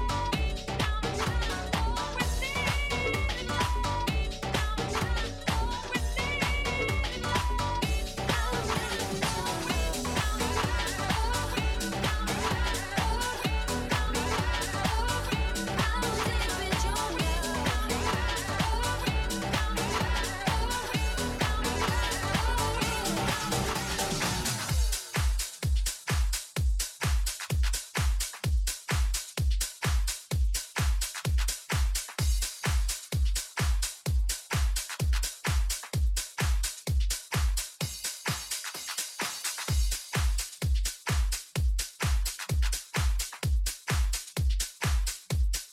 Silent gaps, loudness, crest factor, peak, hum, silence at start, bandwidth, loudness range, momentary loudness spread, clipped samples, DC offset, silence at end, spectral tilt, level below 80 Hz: none; -30 LUFS; 18 dB; -12 dBFS; none; 0 s; 16.5 kHz; 2 LU; 3 LU; under 0.1%; under 0.1%; 0 s; -3.5 dB/octave; -32 dBFS